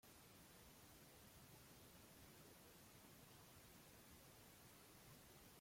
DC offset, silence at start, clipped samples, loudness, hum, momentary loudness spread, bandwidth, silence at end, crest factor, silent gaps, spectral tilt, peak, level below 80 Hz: under 0.1%; 0.05 s; under 0.1%; -65 LUFS; none; 0 LU; 16.5 kHz; 0 s; 14 dB; none; -3.5 dB/octave; -52 dBFS; -78 dBFS